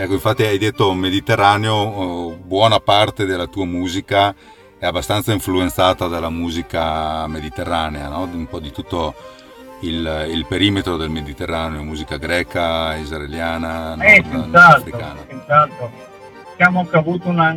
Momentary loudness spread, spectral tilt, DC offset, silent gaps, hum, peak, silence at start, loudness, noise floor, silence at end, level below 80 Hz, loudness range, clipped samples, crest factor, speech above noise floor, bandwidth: 13 LU; -5 dB/octave; under 0.1%; none; none; 0 dBFS; 0 s; -16 LUFS; -38 dBFS; 0 s; -38 dBFS; 10 LU; 0.1%; 18 dB; 21 dB; 19 kHz